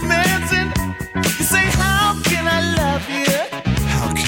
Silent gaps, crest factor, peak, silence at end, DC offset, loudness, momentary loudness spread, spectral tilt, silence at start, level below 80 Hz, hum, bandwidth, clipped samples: none; 16 dB; -2 dBFS; 0 s; under 0.1%; -17 LUFS; 6 LU; -4 dB/octave; 0 s; -30 dBFS; none; 17 kHz; under 0.1%